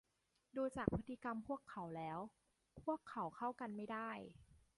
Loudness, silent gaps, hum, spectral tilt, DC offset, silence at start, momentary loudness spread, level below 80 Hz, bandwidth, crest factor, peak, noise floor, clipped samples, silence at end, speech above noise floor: -47 LUFS; none; none; -7.5 dB/octave; under 0.1%; 0.55 s; 9 LU; -66 dBFS; 11.5 kHz; 28 dB; -18 dBFS; -81 dBFS; under 0.1%; 0.2 s; 35 dB